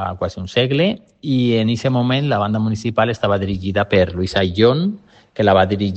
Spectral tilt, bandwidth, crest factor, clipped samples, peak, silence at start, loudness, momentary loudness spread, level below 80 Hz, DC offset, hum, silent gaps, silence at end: -7 dB/octave; 8.4 kHz; 16 dB; under 0.1%; 0 dBFS; 0 s; -17 LUFS; 8 LU; -48 dBFS; under 0.1%; none; none; 0 s